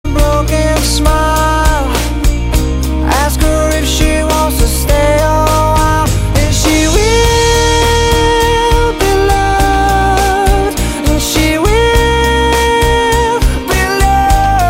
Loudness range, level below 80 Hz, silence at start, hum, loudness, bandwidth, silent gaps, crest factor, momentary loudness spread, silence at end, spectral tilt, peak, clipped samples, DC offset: 2 LU; -14 dBFS; 0.05 s; none; -11 LUFS; 16.5 kHz; none; 10 dB; 4 LU; 0 s; -4.5 dB/octave; 0 dBFS; under 0.1%; under 0.1%